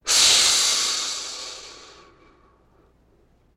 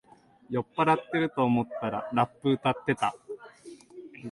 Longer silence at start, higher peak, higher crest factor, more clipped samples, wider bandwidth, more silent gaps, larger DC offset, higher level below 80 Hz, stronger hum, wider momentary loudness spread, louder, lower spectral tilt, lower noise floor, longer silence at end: second, 0.05 s vs 0.5 s; first, -6 dBFS vs -10 dBFS; about the same, 18 dB vs 20 dB; neither; first, 16.5 kHz vs 11.5 kHz; neither; neither; first, -58 dBFS vs -66 dBFS; neither; first, 23 LU vs 20 LU; first, -17 LUFS vs -28 LUFS; second, 2.5 dB/octave vs -7 dB/octave; first, -59 dBFS vs -49 dBFS; first, 1.7 s vs 0 s